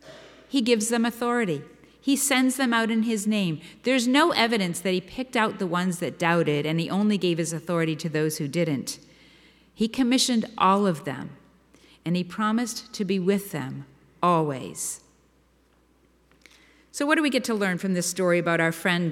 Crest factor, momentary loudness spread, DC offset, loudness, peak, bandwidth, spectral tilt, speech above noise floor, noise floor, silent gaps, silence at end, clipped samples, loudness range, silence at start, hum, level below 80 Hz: 20 dB; 10 LU; under 0.1%; -24 LUFS; -6 dBFS; 17 kHz; -4.5 dB/octave; 38 dB; -62 dBFS; none; 0 s; under 0.1%; 6 LU; 0.05 s; none; -64 dBFS